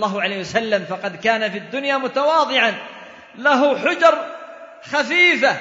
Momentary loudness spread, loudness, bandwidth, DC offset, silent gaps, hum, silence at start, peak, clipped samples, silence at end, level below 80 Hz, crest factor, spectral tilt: 18 LU; -18 LUFS; 7.8 kHz; under 0.1%; none; none; 0 s; -2 dBFS; under 0.1%; 0 s; -66 dBFS; 18 dB; -3.5 dB/octave